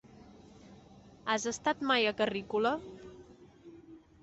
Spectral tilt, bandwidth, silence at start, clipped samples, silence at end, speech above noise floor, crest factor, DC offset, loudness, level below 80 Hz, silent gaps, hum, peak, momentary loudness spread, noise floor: -3 dB/octave; 8.2 kHz; 0.2 s; under 0.1%; 0.25 s; 25 dB; 20 dB; under 0.1%; -32 LUFS; -66 dBFS; none; none; -14 dBFS; 24 LU; -56 dBFS